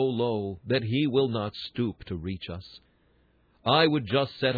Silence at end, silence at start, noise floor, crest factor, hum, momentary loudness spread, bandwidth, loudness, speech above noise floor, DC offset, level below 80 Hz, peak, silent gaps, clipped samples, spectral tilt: 0 s; 0 s; -65 dBFS; 20 dB; none; 14 LU; 4.9 kHz; -27 LUFS; 38 dB; under 0.1%; -58 dBFS; -8 dBFS; none; under 0.1%; -8.5 dB/octave